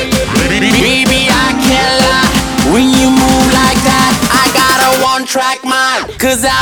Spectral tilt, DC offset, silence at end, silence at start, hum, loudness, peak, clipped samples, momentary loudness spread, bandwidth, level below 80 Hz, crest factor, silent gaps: -3 dB/octave; under 0.1%; 0 s; 0 s; none; -9 LUFS; 0 dBFS; under 0.1%; 4 LU; over 20 kHz; -26 dBFS; 10 dB; none